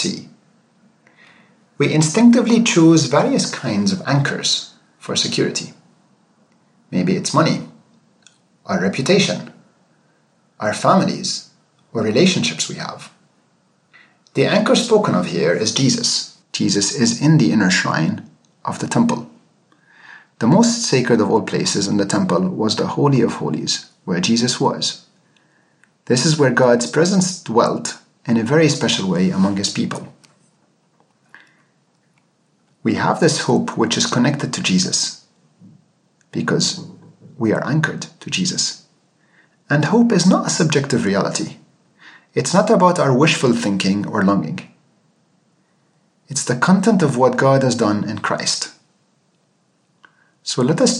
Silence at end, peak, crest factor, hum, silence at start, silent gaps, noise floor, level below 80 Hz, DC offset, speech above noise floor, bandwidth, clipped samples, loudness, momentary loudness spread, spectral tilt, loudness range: 0 s; 0 dBFS; 18 dB; none; 0 s; none; -62 dBFS; -66 dBFS; under 0.1%; 46 dB; 11.5 kHz; under 0.1%; -17 LUFS; 11 LU; -4.5 dB/octave; 6 LU